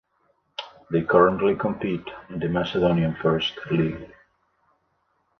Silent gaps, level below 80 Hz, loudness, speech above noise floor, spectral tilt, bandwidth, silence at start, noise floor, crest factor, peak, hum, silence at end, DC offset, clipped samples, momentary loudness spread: none; -52 dBFS; -23 LUFS; 47 dB; -8 dB/octave; 6.4 kHz; 0.6 s; -70 dBFS; 22 dB; -4 dBFS; none; 1.35 s; under 0.1%; under 0.1%; 19 LU